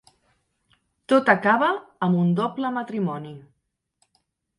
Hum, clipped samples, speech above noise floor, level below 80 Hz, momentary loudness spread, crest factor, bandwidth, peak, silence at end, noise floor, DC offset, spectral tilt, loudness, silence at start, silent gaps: none; under 0.1%; 55 dB; -70 dBFS; 10 LU; 24 dB; 11 kHz; -2 dBFS; 1.2 s; -77 dBFS; under 0.1%; -7.5 dB/octave; -22 LUFS; 1.1 s; none